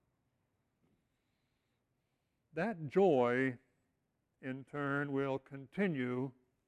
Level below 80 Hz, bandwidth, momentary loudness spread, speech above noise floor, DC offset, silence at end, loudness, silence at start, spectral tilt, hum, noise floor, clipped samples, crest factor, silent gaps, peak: -80 dBFS; 9 kHz; 16 LU; 48 dB; under 0.1%; 0.35 s; -36 LUFS; 2.55 s; -8 dB/octave; none; -83 dBFS; under 0.1%; 20 dB; none; -20 dBFS